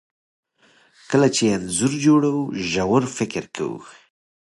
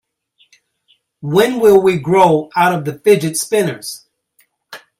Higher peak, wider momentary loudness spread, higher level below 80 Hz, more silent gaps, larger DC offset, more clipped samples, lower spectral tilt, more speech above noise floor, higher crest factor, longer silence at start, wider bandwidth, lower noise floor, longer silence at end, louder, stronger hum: second, -4 dBFS vs 0 dBFS; second, 12 LU vs 17 LU; about the same, -54 dBFS vs -56 dBFS; neither; neither; neither; about the same, -5 dB/octave vs -5 dB/octave; second, 37 dB vs 46 dB; about the same, 18 dB vs 16 dB; second, 1.1 s vs 1.25 s; second, 11.5 kHz vs 16 kHz; about the same, -58 dBFS vs -59 dBFS; first, 0.55 s vs 0.25 s; second, -20 LUFS vs -13 LUFS; neither